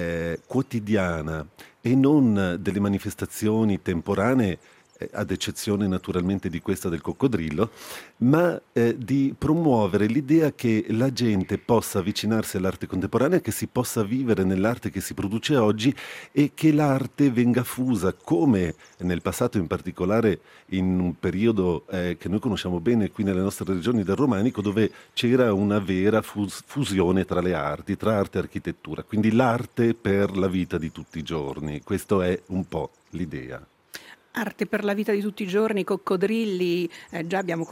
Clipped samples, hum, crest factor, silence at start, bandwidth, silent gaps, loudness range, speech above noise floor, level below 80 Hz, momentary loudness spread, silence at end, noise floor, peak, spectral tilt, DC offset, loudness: under 0.1%; none; 18 dB; 0 s; 16 kHz; none; 4 LU; 21 dB; -54 dBFS; 11 LU; 0 s; -45 dBFS; -6 dBFS; -6.5 dB/octave; under 0.1%; -24 LUFS